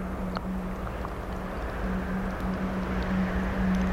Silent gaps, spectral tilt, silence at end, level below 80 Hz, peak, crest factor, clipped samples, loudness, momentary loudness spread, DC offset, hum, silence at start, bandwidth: none; -7.5 dB/octave; 0 s; -36 dBFS; -14 dBFS; 14 dB; under 0.1%; -31 LUFS; 7 LU; under 0.1%; none; 0 s; 15 kHz